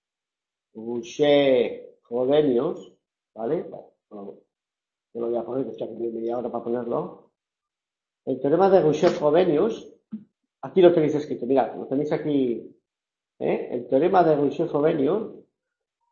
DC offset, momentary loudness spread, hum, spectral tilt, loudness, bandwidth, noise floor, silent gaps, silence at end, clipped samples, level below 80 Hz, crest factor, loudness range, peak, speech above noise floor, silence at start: under 0.1%; 21 LU; none; -7 dB/octave; -23 LUFS; 7.2 kHz; -90 dBFS; none; 0.7 s; under 0.1%; -66 dBFS; 20 dB; 10 LU; -4 dBFS; 68 dB; 0.75 s